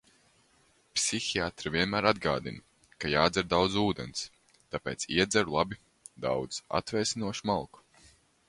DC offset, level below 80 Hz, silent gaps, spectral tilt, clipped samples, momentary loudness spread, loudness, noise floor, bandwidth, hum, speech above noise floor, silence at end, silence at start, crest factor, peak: under 0.1%; -56 dBFS; none; -3.5 dB/octave; under 0.1%; 12 LU; -30 LUFS; -66 dBFS; 11.5 kHz; none; 36 dB; 0.85 s; 0.95 s; 24 dB; -8 dBFS